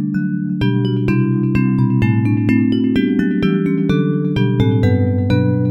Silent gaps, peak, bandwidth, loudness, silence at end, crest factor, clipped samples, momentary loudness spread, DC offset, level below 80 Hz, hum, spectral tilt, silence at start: none; -2 dBFS; 6.4 kHz; -16 LUFS; 0 s; 14 dB; under 0.1%; 2 LU; under 0.1%; -38 dBFS; none; -9.5 dB/octave; 0 s